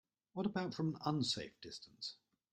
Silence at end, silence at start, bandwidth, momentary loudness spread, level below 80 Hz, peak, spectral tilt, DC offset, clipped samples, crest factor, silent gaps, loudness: 0.4 s; 0.35 s; 11.5 kHz; 13 LU; -76 dBFS; -22 dBFS; -5 dB/octave; under 0.1%; under 0.1%; 20 dB; none; -41 LUFS